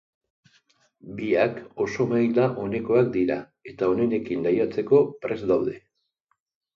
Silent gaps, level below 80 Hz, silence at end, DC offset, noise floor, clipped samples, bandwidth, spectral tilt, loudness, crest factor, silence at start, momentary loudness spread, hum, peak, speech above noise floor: none; -60 dBFS; 0.95 s; under 0.1%; -74 dBFS; under 0.1%; 7 kHz; -8 dB/octave; -24 LUFS; 18 dB; 1.05 s; 11 LU; none; -6 dBFS; 51 dB